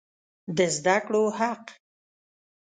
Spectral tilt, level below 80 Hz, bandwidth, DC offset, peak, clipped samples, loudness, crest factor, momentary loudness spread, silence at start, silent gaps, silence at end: -4 dB/octave; -72 dBFS; 9.6 kHz; under 0.1%; -8 dBFS; under 0.1%; -25 LUFS; 20 dB; 13 LU; 0.5 s; none; 0.9 s